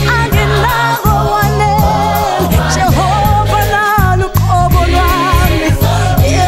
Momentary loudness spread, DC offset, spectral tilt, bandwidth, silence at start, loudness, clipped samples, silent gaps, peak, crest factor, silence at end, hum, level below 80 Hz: 1 LU; under 0.1%; -5.5 dB/octave; 16.5 kHz; 0 s; -11 LUFS; under 0.1%; none; 0 dBFS; 10 dB; 0 s; none; -18 dBFS